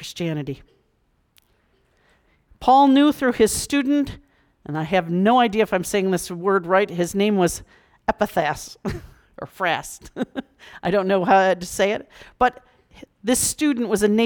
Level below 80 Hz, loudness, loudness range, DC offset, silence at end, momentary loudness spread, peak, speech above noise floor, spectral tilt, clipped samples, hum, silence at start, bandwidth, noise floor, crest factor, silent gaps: -48 dBFS; -21 LUFS; 5 LU; under 0.1%; 0 s; 14 LU; -6 dBFS; 45 dB; -4.5 dB/octave; under 0.1%; none; 0 s; 19.5 kHz; -65 dBFS; 16 dB; none